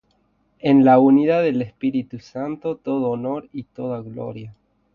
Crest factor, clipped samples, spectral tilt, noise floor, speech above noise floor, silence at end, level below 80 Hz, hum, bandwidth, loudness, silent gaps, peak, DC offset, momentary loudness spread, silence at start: 18 dB; under 0.1%; -9 dB/octave; -64 dBFS; 45 dB; 0.45 s; -60 dBFS; none; 5.8 kHz; -19 LUFS; none; -2 dBFS; under 0.1%; 19 LU; 0.65 s